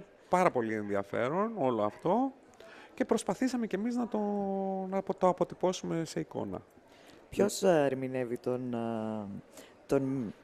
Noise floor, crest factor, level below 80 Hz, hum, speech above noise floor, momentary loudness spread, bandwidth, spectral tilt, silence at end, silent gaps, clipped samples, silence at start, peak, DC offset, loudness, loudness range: -57 dBFS; 22 dB; -68 dBFS; none; 25 dB; 10 LU; 14.5 kHz; -6 dB/octave; 0.1 s; none; under 0.1%; 0 s; -10 dBFS; under 0.1%; -32 LUFS; 2 LU